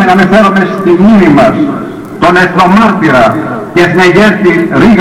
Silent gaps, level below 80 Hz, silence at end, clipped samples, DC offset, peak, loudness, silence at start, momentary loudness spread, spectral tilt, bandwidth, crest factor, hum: none; -34 dBFS; 0 s; 2%; under 0.1%; 0 dBFS; -6 LUFS; 0 s; 8 LU; -6.5 dB/octave; 14 kHz; 6 dB; none